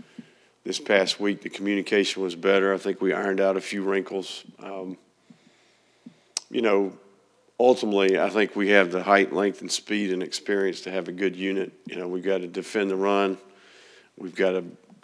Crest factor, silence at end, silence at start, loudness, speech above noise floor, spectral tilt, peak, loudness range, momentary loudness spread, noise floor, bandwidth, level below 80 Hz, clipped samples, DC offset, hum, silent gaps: 22 dB; 0.3 s; 0.2 s; -24 LUFS; 37 dB; -4 dB/octave; -4 dBFS; 7 LU; 16 LU; -62 dBFS; 11 kHz; -86 dBFS; under 0.1%; under 0.1%; none; none